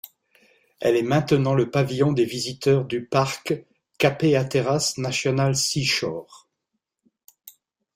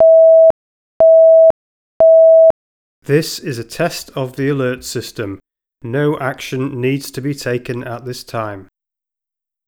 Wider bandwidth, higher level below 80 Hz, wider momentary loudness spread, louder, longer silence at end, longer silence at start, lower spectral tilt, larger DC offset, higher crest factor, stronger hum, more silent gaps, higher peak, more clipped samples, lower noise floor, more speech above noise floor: about the same, 16 kHz vs 16.5 kHz; second, -58 dBFS vs -52 dBFS; second, 6 LU vs 20 LU; second, -22 LUFS vs -13 LUFS; second, 0.45 s vs 1.05 s; about the same, 0.05 s vs 0 s; about the same, -5 dB/octave vs -6 dB/octave; neither; first, 20 dB vs 12 dB; neither; second, none vs 0.50-1.00 s, 1.50-2.00 s, 2.50-3.02 s; second, -4 dBFS vs 0 dBFS; neither; second, -80 dBFS vs -87 dBFS; second, 58 dB vs 67 dB